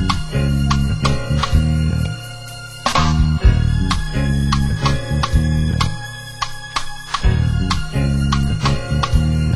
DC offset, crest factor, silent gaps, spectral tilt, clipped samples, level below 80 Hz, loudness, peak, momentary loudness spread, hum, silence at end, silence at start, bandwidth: under 0.1%; 16 dB; none; -5.5 dB/octave; under 0.1%; -22 dBFS; -18 LUFS; -2 dBFS; 9 LU; none; 0 s; 0 s; 13 kHz